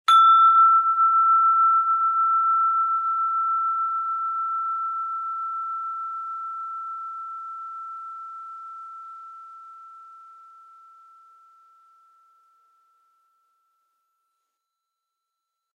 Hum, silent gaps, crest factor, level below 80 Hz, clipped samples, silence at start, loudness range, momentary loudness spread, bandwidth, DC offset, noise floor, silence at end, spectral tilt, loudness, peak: none; none; 16 dB; under -90 dBFS; under 0.1%; 0.1 s; 23 LU; 23 LU; 11.5 kHz; under 0.1%; -83 dBFS; 5.55 s; 6 dB/octave; -20 LUFS; -8 dBFS